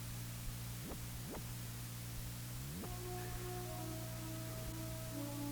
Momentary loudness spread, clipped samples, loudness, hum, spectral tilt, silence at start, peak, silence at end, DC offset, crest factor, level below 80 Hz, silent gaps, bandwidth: 2 LU; under 0.1%; -46 LUFS; none; -4.5 dB/octave; 0 s; -32 dBFS; 0 s; under 0.1%; 14 dB; -54 dBFS; none; over 20 kHz